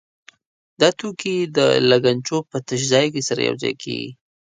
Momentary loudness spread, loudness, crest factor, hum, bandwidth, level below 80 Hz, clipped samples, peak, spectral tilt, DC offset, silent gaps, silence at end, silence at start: 11 LU; -19 LUFS; 20 dB; none; 9.6 kHz; -62 dBFS; under 0.1%; 0 dBFS; -4 dB/octave; under 0.1%; none; 0.35 s; 0.8 s